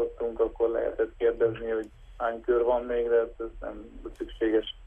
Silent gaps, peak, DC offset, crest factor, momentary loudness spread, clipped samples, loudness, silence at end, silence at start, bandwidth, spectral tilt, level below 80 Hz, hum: none; -14 dBFS; under 0.1%; 14 dB; 14 LU; under 0.1%; -28 LUFS; 0 s; 0 s; 3.6 kHz; -7 dB/octave; -48 dBFS; none